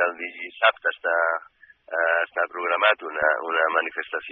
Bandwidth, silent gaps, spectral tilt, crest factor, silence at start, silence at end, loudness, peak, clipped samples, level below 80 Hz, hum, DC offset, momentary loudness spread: 4.5 kHz; none; 2.5 dB/octave; 20 dB; 0 s; 0 s; -23 LUFS; -4 dBFS; under 0.1%; -72 dBFS; none; under 0.1%; 10 LU